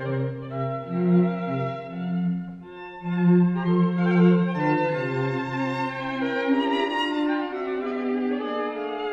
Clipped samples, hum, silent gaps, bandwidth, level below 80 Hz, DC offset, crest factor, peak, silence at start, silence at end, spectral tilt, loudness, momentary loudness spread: under 0.1%; none; none; 5.8 kHz; -62 dBFS; under 0.1%; 16 dB; -8 dBFS; 0 s; 0 s; -8.5 dB/octave; -24 LUFS; 10 LU